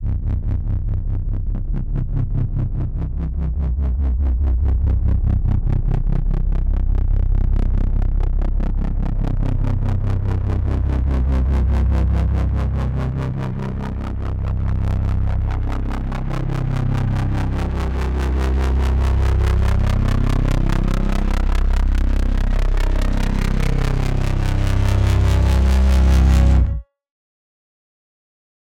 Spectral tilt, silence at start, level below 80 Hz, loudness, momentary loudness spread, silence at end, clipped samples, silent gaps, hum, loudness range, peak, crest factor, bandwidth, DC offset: -7.5 dB/octave; 0 s; -18 dBFS; -21 LUFS; 8 LU; 1.95 s; under 0.1%; none; none; 5 LU; -4 dBFS; 14 dB; 9.2 kHz; under 0.1%